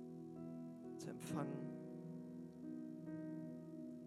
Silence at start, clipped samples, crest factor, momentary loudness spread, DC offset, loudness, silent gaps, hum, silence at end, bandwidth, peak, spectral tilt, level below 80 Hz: 0 s; under 0.1%; 20 dB; 7 LU; under 0.1%; -51 LUFS; none; 50 Hz at -80 dBFS; 0 s; 13.5 kHz; -30 dBFS; -7 dB/octave; -88 dBFS